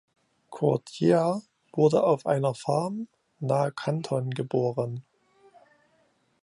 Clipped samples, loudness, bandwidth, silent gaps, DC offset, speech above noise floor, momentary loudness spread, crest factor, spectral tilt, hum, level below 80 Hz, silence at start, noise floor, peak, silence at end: under 0.1%; -27 LUFS; 11 kHz; none; under 0.1%; 42 dB; 14 LU; 18 dB; -7.5 dB/octave; none; -72 dBFS; 0.5 s; -68 dBFS; -8 dBFS; 1.45 s